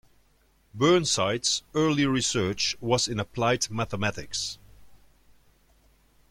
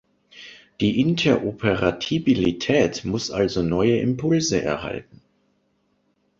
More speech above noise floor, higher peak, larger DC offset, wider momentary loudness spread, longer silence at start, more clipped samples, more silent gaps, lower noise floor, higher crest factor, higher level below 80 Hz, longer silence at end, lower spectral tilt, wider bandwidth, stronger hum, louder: second, 38 dB vs 46 dB; second, -8 dBFS vs -4 dBFS; neither; second, 9 LU vs 13 LU; first, 0.75 s vs 0.35 s; neither; neither; about the same, -64 dBFS vs -67 dBFS; about the same, 18 dB vs 18 dB; second, -56 dBFS vs -48 dBFS; about the same, 1.35 s vs 1.4 s; second, -3.5 dB/octave vs -5.5 dB/octave; first, 16 kHz vs 7.8 kHz; neither; second, -26 LUFS vs -22 LUFS